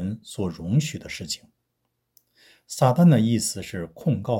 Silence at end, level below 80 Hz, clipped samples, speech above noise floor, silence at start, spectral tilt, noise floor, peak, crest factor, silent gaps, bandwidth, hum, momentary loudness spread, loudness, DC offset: 0 s; -56 dBFS; under 0.1%; 54 dB; 0 s; -6 dB/octave; -76 dBFS; -4 dBFS; 20 dB; none; 17 kHz; none; 16 LU; -23 LUFS; under 0.1%